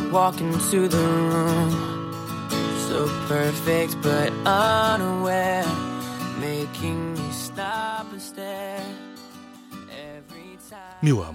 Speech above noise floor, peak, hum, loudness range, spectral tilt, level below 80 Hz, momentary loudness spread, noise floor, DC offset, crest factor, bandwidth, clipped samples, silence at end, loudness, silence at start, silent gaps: 21 dB; -6 dBFS; none; 10 LU; -5 dB/octave; -58 dBFS; 21 LU; -44 dBFS; under 0.1%; 18 dB; 17 kHz; under 0.1%; 0 s; -24 LUFS; 0 s; none